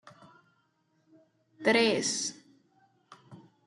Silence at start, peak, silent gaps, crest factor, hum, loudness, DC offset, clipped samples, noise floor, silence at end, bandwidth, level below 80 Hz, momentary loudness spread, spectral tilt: 1.6 s; -12 dBFS; none; 22 dB; none; -28 LUFS; under 0.1%; under 0.1%; -73 dBFS; 0.3 s; 12 kHz; -82 dBFS; 9 LU; -2.5 dB/octave